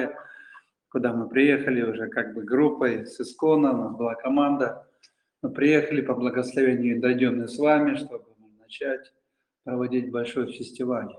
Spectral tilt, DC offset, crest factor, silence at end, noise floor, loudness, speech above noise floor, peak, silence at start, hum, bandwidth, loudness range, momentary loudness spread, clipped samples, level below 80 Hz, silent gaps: -6.5 dB/octave; under 0.1%; 18 dB; 0.05 s; -63 dBFS; -25 LUFS; 39 dB; -6 dBFS; 0 s; none; 10.5 kHz; 4 LU; 14 LU; under 0.1%; -70 dBFS; none